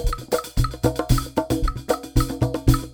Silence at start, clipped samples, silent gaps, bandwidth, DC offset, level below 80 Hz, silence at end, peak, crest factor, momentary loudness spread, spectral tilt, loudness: 0 s; under 0.1%; none; over 20 kHz; under 0.1%; -26 dBFS; 0 s; -4 dBFS; 18 dB; 4 LU; -6 dB/octave; -23 LUFS